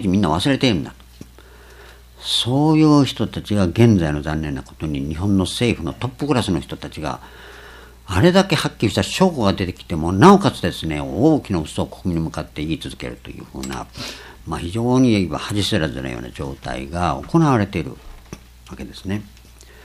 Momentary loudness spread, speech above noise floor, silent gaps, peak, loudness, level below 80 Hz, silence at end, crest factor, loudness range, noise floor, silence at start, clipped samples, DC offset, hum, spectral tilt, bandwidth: 17 LU; 25 dB; none; 0 dBFS; -19 LUFS; -40 dBFS; 0.2 s; 20 dB; 6 LU; -44 dBFS; 0 s; under 0.1%; under 0.1%; none; -6 dB/octave; 14.5 kHz